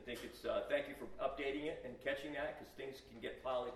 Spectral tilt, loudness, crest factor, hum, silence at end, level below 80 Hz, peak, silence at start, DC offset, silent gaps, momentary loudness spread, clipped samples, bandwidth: -4.5 dB/octave; -44 LUFS; 18 dB; none; 0 s; -66 dBFS; -24 dBFS; 0 s; under 0.1%; none; 10 LU; under 0.1%; 13.5 kHz